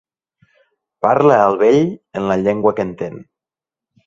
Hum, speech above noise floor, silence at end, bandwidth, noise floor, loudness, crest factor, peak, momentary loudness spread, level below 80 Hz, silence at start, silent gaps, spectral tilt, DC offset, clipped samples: none; 74 dB; 0.85 s; 7.4 kHz; -89 dBFS; -15 LUFS; 18 dB; 0 dBFS; 12 LU; -54 dBFS; 1.05 s; none; -7.5 dB/octave; under 0.1%; under 0.1%